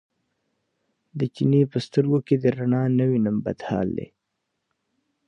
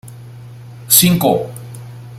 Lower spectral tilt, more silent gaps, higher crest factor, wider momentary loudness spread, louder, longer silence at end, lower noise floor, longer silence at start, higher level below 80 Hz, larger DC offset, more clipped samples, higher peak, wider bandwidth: first, -9 dB/octave vs -3.5 dB/octave; neither; about the same, 18 dB vs 18 dB; second, 9 LU vs 23 LU; second, -23 LUFS vs -12 LUFS; first, 1.25 s vs 0 s; first, -79 dBFS vs -34 dBFS; first, 1.15 s vs 0.05 s; second, -58 dBFS vs -48 dBFS; neither; neither; second, -8 dBFS vs 0 dBFS; second, 9 kHz vs 16.5 kHz